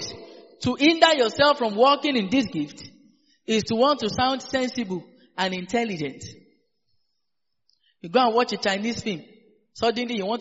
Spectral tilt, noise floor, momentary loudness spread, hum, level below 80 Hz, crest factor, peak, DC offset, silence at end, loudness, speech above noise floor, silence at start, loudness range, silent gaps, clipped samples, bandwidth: -2.5 dB/octave; -83 dBFS; 17 LU; none; -60 dBFS; 24 dB; -2 dBFS; under 0.1%; 0 s; -23 LUFS; 61 dB; 0 s; 8 LU; none; under 0.1%; 8 kHz